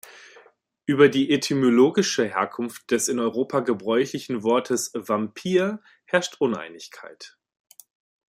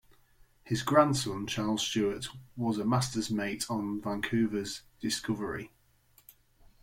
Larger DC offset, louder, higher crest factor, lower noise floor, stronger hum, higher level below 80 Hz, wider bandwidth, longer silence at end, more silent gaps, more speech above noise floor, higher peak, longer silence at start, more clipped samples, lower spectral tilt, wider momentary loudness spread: neither; first, -23 LUFS vs -31 LUFS; about the same, 20 dB vs 22 dB; second, -57 dBFS vs -65 dBFS; neither; second, -70 dBFS vs -60 dBFS; about the same, 15.5 kHz vs 16.5 kHz; second, 1 s vs 1.15 s; neither; about the same, 34 dB vs 34 dB; first, -2 dBFS vs -10 dBFS; first, 0.9 s vs 0.65 s; neither; about the same, -4.5 dB/octave vs -4.5 dB/octave; first, 15 LU vs 12 LU